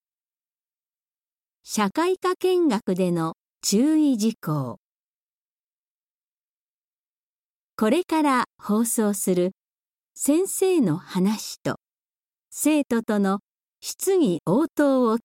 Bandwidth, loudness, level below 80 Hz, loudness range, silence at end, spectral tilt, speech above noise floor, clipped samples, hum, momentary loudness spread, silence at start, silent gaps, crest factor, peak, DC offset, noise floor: 16.5 kHz; -23 LUFS; -70 dBFS; 5 LU; 0.05 s; -5 dB/octave; over 68 dB; under 0.1%; none; 10 LU; 1.65 s; 4.77-7.77 s, 9.72-9.76 s, 13.43-13.47 s; 16 dB; -10 dBFS; under 0.1%; under -90 dBFS